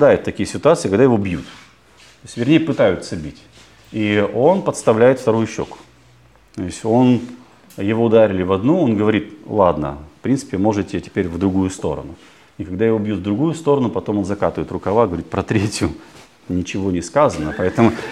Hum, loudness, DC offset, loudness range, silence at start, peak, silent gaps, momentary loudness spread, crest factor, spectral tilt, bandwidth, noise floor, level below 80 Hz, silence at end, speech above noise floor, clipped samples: none; -18 LUFS; 0.1%; 4 LU; 0 s; 0 dBFS; none; 14 LU; 16 dB; -6.5 dB/octave; 13 kHz; -50 dBFS; -46 dBFS; 0 s; 33 dB; under 0.1%